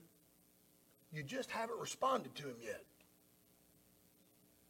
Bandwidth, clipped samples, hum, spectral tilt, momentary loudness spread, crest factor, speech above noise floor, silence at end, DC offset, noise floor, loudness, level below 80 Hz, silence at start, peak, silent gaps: 18 kHz; under 0.1%; 60 Hz at -80 dBFS; -3.5 dB/octave; 14 LU; 22 dB; 28 dB; 1.85 s; under 0.1%; -71 dBFS; -43 LUFS; -84 dBFS; 0 s; -24 dBFS; none